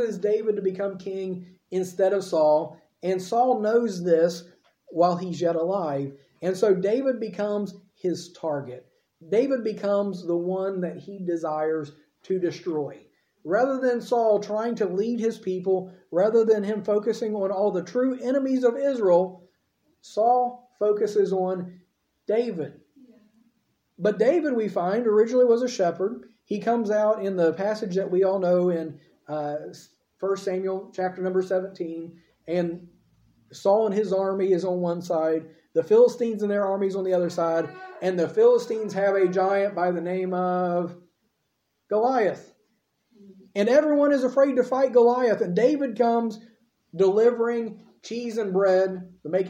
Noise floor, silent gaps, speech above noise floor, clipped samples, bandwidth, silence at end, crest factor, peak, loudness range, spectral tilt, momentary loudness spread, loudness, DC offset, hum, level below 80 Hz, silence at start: -75 dBFS; none; 52 dB; under 0.1%; 10.5 kHz; 0 s; 16 dB; -8 dBFS; 6 LU; -6.5 dB/octave; 12 LU; -24 LUFS; under 0.1%; none; -76 dBFS; 0 s